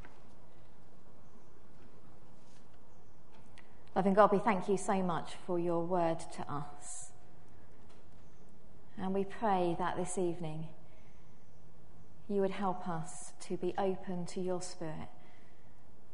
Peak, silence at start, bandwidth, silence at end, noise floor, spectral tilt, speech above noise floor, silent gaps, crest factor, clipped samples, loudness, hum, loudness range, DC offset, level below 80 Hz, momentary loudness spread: -10 dBFS; 0 s; 10.5 kHz; 1 s; -62 dBFS; -6 dB/octave; 27 dB; none; 26 dB; under 0.1%; -35 LUFS; none; 8 LU; 1%; -64 dBFS; 15 LU